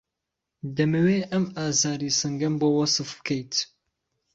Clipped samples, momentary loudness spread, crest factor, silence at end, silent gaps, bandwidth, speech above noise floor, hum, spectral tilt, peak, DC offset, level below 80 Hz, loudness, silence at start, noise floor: under 0.1%; 8 LU; 16 dB; 0.7 s; none; 8 kHz; 60 dB; none; -4 dB/octave; -10 dBFS; under 0.1%; -62 dBFS; -24 LUFS; 0.65 s; -84 dBFS